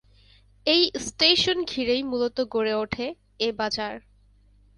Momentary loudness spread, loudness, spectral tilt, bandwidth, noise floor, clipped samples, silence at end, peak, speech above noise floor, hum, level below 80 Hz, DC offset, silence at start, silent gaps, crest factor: 12 LU; -24 LUFS; -3 dB/octave; 11.5 kHz; -57 dBFS; under 0.1%; 0.8 s; -4 dBFS; 33 dB; 50 Hz at -55 dBFS; -54 dBFS; under 0.1%; 0.65 s; none; 22 dB